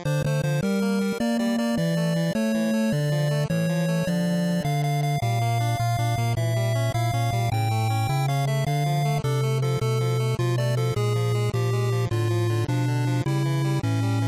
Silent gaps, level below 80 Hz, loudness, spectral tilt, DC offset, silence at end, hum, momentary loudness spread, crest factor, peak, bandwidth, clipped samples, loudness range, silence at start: none; -50 dBFS; -24 LUFS; -6.5 dB/octave; under 0.1%; 0 s; none; 1 LU; 10 dB; -14 dBFS; 16 kHz; under 0.1%; 0 LU; 0 s